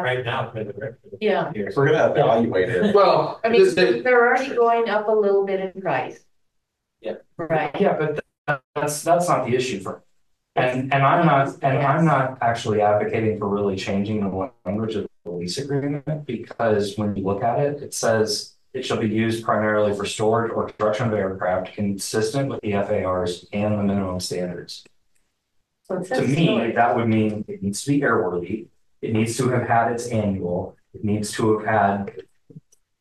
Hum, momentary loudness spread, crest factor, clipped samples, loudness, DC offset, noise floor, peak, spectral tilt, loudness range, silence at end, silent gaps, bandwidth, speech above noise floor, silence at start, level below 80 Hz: none; 13 LU; 16 dB; under 0.1%; -22 LUFS; under 0.1%; -75 dBFS; -6 dBFS; -5.5 dB/octave; 7 LU; 0.4 s; 8.38-8.45 s, 8.64-8.74 s; 12.5 kHz; 54 dB; 0 s; -60 dBFS